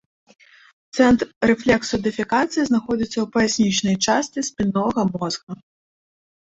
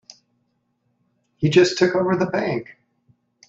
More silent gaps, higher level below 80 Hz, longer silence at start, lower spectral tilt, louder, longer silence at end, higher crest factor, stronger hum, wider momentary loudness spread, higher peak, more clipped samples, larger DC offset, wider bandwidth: first, 1.36-1.41 s, 5.43-5.47 s vs none; first, -50 dBFS vs -60 dBFS; second, 0.95 s vs 1.4 s; about the same, -4.5 dB/octave vs -5.5 dB/octave; about the same, -20 LUFS vs -19 LUFS; about the same, 0.95 s vs 0.85 s; about the same, 18 dB vs 20 dB; neither; about the same, 9 LU vs 9 LU; about the same, -2 dBFS vs -2 dBFS; neither; neither; about the same, 8.2 kHz vs 7.8 kHz